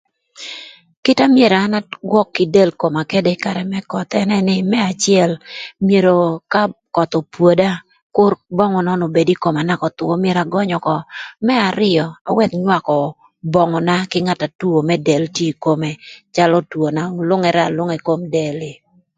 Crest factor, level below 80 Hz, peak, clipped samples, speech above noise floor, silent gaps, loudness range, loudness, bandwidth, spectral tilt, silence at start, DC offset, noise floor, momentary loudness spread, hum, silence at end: 16 dB; -56 dBFS; 0 dBFS; under 0.1%; 20 dB; 0.97-1.03 s, 8.02-8.10 s, 12.21-12.25 s, 14.55-14.59 s; 2 LU; -16 LUFS; 9.4 kHz; -6 dB/octave; 0.4 s; under 0.1%; -36 dBFS; 9 LU; none; 0.45 s